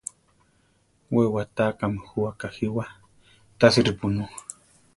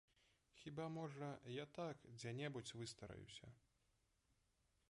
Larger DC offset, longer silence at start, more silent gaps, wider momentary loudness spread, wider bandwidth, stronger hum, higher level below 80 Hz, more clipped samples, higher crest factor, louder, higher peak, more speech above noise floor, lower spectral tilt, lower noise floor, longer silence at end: neither; first, 1.1 s vs 0.55 s; neither; first, 19 LU vs 10 LU; about the same, 11.5 kHz vs 11 kHz; neither; first, -52 dBFS vs -78 dBFS; neither; first, 24 dB vs 16 dB; first, -24 LUFS vs -53 LUFS; first, -2 dBFS vs -38 dBFS; first, 41 dB vs 32 dB; about the same, -5.5 dB/octave vs -5 dB/octave; second, -64 dBFS vs -84 dBFS; second, 0.55 s vs 1.35 s